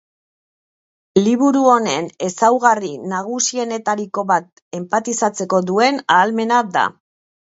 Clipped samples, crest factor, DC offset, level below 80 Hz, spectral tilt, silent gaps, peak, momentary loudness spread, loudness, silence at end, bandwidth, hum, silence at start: under 0.1%; 18 dB; under 0.1%; -66 dBFS; -4 dB/octave; 4.62-4.71 s; 0 dBFS; 9 LU; -17 LUFS; 0.65 s; 8 kHz; none; 1.15 s